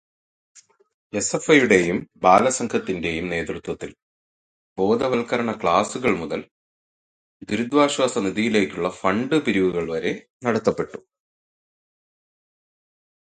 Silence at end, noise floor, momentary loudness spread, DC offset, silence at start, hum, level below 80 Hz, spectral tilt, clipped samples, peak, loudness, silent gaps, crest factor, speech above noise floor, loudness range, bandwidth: 2.35 s; under -90 dBFS; 13 LU; under 0.1%; 0.55 s; none; -54 dBFS; -4.5 dB/octave; under 0.1%; 0 dBFS; -21 LUFS; 0.94-1.10 s, 4.02-4.76 s, 6.51-7.40 s, 10.30-10.40 s; 22 dB; over 69 dB; 5 LU; 10.5 kHz